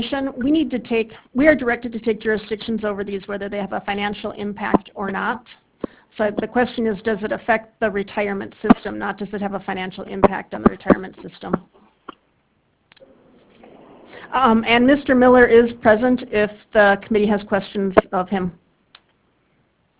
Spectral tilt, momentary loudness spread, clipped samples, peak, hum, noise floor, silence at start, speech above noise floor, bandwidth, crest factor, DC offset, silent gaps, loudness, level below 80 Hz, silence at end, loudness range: -10 dB/octave; 12 LU; under 0.1%; 0 dBFS; none; -64 dBFS; 0 s; 45 dB; 4 kHz; 20 dB; under 0.1%; none; -19 LUFS; -46 dBFS; 1.5 s; 9 LU